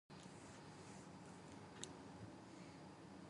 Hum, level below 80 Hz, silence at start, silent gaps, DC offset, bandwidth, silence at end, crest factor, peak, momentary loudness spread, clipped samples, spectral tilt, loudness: none; -78 dBFS; 0.1 s; none; under 0.1%; 11.5 kHz; 0 s; 30 dB; -28 dBFS; 4 LU; under 0.1%; -4.5 dB/octave; -57 LUFS